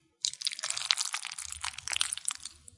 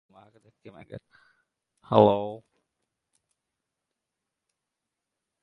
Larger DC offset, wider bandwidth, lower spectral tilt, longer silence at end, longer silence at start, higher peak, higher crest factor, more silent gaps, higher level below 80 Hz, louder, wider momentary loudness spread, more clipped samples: neither; first, 11.5 kHz vs 5.2 kHz; second, 3 dB/octave vs -9 dB/octave; second, 0 s vs 3.05 s; second, 0.25 s vs 0.65 s; about the same, -2 dBFS vs -2 dBFS; first, 34 dB vs 28 dB; neither; about the same, -66 dBFS vs -66 dBFS; second, -32 LUFS vs -22 LUFS; second, 8 LU vs 26 LU; neither